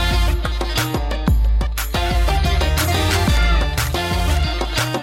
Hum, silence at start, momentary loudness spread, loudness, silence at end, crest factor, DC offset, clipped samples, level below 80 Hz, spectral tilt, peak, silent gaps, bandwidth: none; 0 s; 4 LU; -19 LUFS; 0 s; 14 dB; under 0.1%; under 0.1%; -20 dBFS; -4.5 dB/octave; -4 dBFS; none; 17 kHz